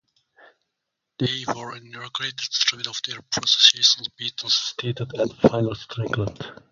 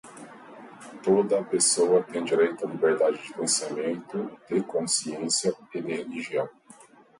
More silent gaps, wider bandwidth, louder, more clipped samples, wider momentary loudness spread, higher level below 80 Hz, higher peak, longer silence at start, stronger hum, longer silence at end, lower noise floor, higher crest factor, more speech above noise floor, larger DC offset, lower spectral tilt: neither; about the same, 11 kHz vs 11.5 kHz; first, -21 LUFS vs -26 LUFS; neither; about the same, 17 LU vs 19 LU; first, -56 dBFS vs -74 dBFS; first, 0 dBFS vs -8 dBFS; first, 1.2 s vs 0.05 s; neither; second, 0.2 s vs 0.7 s; first, -81 dBFS vs -53 dBFS; first, 24 dB vs 18 dB; first, 58 dB vs 27 dB; neither; about the same, -3 dB/octave vs -3 dB/octave